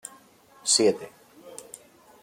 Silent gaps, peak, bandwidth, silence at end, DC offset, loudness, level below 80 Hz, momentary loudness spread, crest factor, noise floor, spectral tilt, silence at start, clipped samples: none; -8 dBFS; 16.5 kHz; 0.6 s; under 0.1%; -23 LUFS; -74 dBFS; 25 LU; 22 dB; -55 dBFS; -2 dB/octave; 0.65 s; under 0.1%